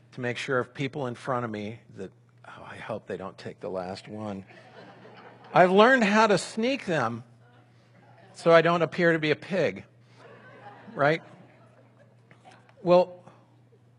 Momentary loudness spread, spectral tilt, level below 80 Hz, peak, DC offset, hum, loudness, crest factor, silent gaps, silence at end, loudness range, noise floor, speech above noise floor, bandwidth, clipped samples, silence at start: 22 LU; -5.5 dB/octave; -74 dBFS; -2 dBFS; under 0.1%; none; -25 LUFS; 24 dB; none; 0.8 s; 13 LU; -58 dBFS; 33 dB; 11.5 kHz; under 0.1%; 0.15 s